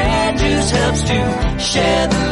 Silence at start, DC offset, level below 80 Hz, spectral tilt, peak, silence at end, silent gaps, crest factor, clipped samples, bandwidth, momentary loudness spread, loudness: 0 s; under 0.1%; -24 dBFS; -4.5 dB/octave; -4 dBFS; 0 s; none; 12 dB; under 0.1%; 11.5 kHz; 2 LU; -16 LUFS